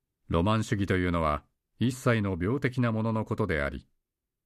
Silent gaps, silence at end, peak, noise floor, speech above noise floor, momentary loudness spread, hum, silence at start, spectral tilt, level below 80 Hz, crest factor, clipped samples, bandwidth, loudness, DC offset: none; 0.65 s; -14 dBFS; -83 dBFS; 56 dB; 5 LU; none; 0.3 s; -7 dB/octave; -46 dBFS; 16 dB; under 0.1%; 13.5 kHz; -29 LUFS; under 0.1%